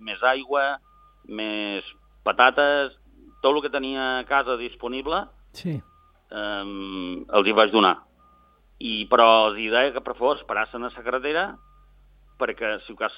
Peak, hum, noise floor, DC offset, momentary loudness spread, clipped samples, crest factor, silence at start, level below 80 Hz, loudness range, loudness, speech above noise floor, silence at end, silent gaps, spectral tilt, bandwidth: -2 dBFS; none; -57 dBFS; under 0.1%; 15 LU; under 0.1%; 22 dB; 0 s; -54 dBFS; 7 LU; -23 LUFS; 34 dB; 0 s; none; -6 dB/octave; 8.6 kHz